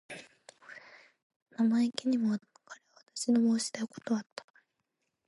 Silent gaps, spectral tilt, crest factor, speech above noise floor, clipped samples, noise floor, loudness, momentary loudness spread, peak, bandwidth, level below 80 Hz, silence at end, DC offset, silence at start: 1.22-1.30 s, 1.36-1.46 s; -4.5 dB/octave; 20 dB; 53 dB; under 0.1%; -83 dBFS; -31 LUFS; 23 LU; -12 dBFS; 11.5 kHz; -84 dBFS; 1.05 s; under 0.1%; 0.1 s